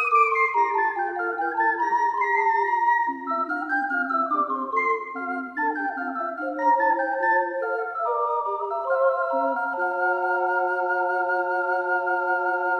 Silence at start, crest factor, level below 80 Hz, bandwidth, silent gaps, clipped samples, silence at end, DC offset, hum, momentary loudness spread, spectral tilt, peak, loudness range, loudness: 0 s; 16 dB; -76 dBFS; 7.6 kHz; none; under 0.1%; 0 s; under 0.1%; none; 6 LU; -4.5 dB/octave; -8 dBFS; 2 LU; -24 LUFS